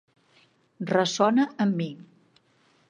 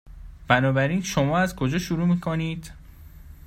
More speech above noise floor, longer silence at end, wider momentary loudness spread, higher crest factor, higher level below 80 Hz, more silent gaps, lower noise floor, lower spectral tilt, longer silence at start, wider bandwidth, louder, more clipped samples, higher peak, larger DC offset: first, 40 dB vs 22 dB; first, 0.9 s vs 0.15 s; first, 15 LU vs 9 LU; about the same, 20 dB vs 22 dB; second, -78 dBFS vs -44 dBFS; neither; first, -64 dBFS vs -45 dBFS; about the same, -5 dB/octave vs -6 dB/octave; first, 0.8 s vs 0.05 s; second, 10 kHz vs 16 kHz; about the same, -25 LUFS vs -23 LUFS; neither; second, -6 dBFS vs -2 dBFS; neither